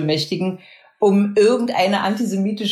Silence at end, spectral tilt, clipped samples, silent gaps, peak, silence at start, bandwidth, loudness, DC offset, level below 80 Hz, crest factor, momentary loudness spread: 0 s; -5.5 dB/octave; under 0.1%; none; -4 dBFS; 0 s; 13.5 kHz; -18 LUFS; under 0.1%; -66 dBFS; 14 dB; 8 LU